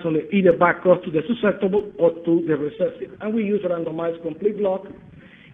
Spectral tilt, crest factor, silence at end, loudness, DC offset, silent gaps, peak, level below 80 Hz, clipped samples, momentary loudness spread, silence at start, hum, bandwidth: -10 dB/octave; 20 dB; 0.35 s; -21 LUFS; under 0.1%; none; -2 dBFS; -58 dBFS; under 0.1%; 9 LU; 0 s; none; 3.9 kHz